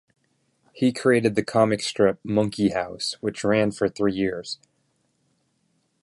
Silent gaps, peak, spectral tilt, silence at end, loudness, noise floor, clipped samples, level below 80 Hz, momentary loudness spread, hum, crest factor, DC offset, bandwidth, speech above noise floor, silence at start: none; -6 dBFS; -5.5 dB/octave; 1.5 s; -23 LUFS; -70 dBFS; under 0.1%; -58 dBFS; 7 LU; none; 20 dB; under 0.1%; 11.5 kHz; 47 dB; 0.75 s